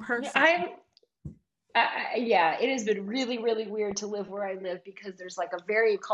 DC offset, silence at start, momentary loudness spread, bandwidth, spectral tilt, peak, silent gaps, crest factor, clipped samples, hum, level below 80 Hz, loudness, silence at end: under 0.1%; 0 s; 18 LU; 11 kHz; -3.5 dB/octave; -8 dBFS; none; 20 dB; under 0.1%; none; -68 dBFS; -28 LUFS; 0 s